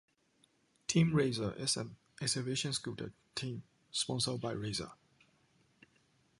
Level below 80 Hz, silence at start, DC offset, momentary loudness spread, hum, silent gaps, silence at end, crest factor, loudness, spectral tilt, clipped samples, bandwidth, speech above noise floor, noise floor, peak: -66 dBFS; 0.9 s; under 0.1%; 14 LU; none; none; 1.45 s; 22 dB; -36 LUFS; -4 dB/octave; under 0.1%; 11.5 kHz; 37 dB; -73 dBFS; -16 dBFS